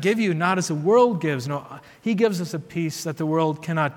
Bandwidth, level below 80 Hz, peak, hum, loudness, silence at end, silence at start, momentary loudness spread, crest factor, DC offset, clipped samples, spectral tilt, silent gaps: 17.5 kHz; -68 dBFS; -6 dBFS; none; -23 LUFS; 0 s; 0 s; 12 LU; 16 dB; under 0.1%; under 0.1%; -6 dB/octave; none